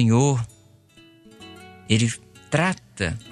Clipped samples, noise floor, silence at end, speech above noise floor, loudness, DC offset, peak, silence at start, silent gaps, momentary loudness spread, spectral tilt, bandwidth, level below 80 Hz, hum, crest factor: under 0.1%; -53 dBFS; 0 s; 32 dB; -23 LUFS; under 0.1%; -4 dBFS; 0 s; none; 23 LU; -5.5 dB/octave; 11.5 kHz; -50 dBFS; none; 20 dB